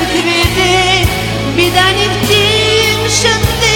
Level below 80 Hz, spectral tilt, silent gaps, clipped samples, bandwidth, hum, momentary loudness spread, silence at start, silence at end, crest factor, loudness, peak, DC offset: -26 dBFS; -3.5 dB/octave; none; 0.2%; 17.5 kHz; none; 3 LU; 0 s; 0 s; 10 dB; -10 LUFS; 0 dBFS; under 0.1%